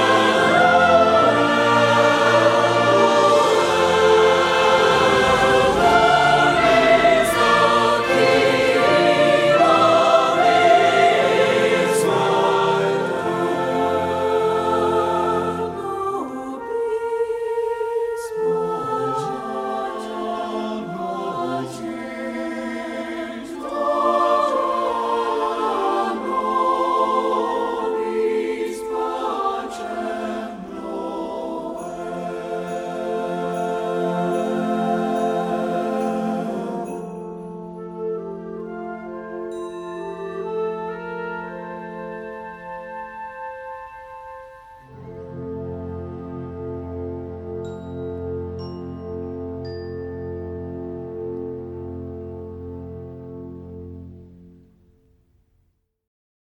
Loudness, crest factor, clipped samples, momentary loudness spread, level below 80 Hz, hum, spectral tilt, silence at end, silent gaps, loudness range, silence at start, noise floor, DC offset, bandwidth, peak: -19 LUFS; 18 dB; under 0.1%; 18 LU; -50 dBFS; none; -4.5 dB/octave; 2.1 s; none; 18 LU; 0 s; -66 dBFS; under 0.1%; 16 kHz; -2 dBFS